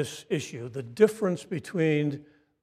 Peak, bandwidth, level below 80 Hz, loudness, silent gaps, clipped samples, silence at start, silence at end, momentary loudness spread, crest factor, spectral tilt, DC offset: -8 dBFS; 14.5 kHz; -72 dBFS; -28 LUFS; none; under 0.1%; 0 s; 0.4 s; 14 LU; 20 dB; -6 dB/octave; under 0.1%